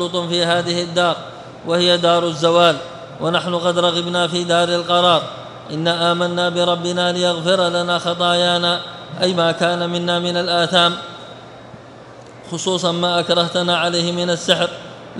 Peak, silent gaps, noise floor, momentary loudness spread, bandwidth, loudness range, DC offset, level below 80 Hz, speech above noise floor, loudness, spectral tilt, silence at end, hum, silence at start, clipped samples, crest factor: 0 dBFS; none; -39 dBFS; 13 LU; 11.5 kHz; 3 LU; under 0.1%; -60 dBFS; 22 dB; -17 LUFS; -4 dB/octave; 0 s; none; 0 s; under 0.1%; 18 dB